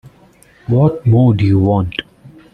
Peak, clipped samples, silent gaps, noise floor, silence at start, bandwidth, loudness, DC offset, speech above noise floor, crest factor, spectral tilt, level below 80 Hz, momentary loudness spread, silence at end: -2 dBFS; under 0.1%; none; -47 dBFS; 0.05 s; 4.6 kHz; -13 LUFS; under 0.1%; 35 dB; 12 dB; -9.5 dB/octave; -42 dBFS; 12 LU; 0.25 s